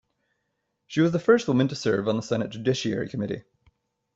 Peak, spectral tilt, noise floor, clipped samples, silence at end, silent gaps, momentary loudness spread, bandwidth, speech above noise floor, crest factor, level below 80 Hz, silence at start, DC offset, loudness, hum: -8 dBFS; -6 dB/octave; -78 dBFS; under 0.1%; 0.75 s; none; 11 LU; 8 kHz; 54 dB; 20 dB; -62 dBFS; 0.9 s; under 0.1%; -25 LUFS; none